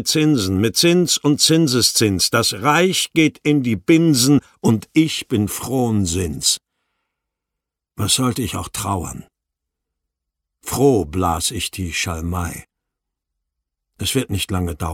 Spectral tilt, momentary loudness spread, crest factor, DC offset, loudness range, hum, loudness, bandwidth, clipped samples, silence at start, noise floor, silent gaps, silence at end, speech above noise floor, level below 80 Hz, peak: -4 dB/octave; 10 LU; 16 dB; under 0.1%; 9 LU; none; -17 LUFS; 17 kHz; under 0.1%; 0 s; -83 dBFS; none; 0 s; 66 dB; -42 dBFS; -2 dBFS